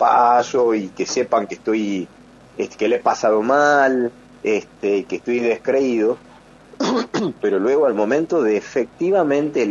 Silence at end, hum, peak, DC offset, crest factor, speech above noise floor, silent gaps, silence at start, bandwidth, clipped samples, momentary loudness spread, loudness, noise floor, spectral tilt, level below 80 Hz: 0 s; none; -2 dBFS; under 0.1%; 16 dB; 27 dB; none; 0 s; 7.6 kHz; under 0.1%; 10 LU; -19 LUFS; -45 dBFS; -5 dB/octave; -60 dBFS